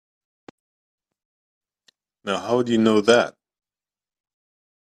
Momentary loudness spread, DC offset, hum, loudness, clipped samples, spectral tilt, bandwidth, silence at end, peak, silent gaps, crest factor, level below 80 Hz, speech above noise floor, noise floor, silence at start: 12 LU; under 0.1%; none; -20 LUFS; under 0.1%; -5 dB/octave; 11.5 kHz; 1.6 s; -2 dBFS; none; 24 dB; -66 dBFS; over 71 dB; under -90 dBFS; 2.25 s